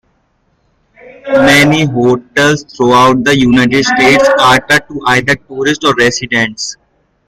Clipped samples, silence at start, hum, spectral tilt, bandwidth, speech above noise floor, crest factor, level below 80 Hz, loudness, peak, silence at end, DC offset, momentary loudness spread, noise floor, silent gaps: under 0.1%; 1.25 s; none; -4.5 dB/octave; 16 kHz; 48 dB; 10 dB; -40 dBFS; -9 LUFS; 0 dBFS; 0.55 s; under 0.1%; 7 LU; -57 dBFS; none